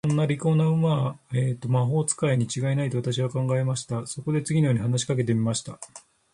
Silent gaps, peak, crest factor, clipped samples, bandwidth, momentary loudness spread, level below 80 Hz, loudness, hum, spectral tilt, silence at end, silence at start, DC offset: none; -10 dBFS; 14 dB; under 0.1%; 11.5 kHz; 7 LU; -60 dBFS; -25 LUFS; none; -6 dB/octave; 0.35 s; 0.05 s; under 0.1%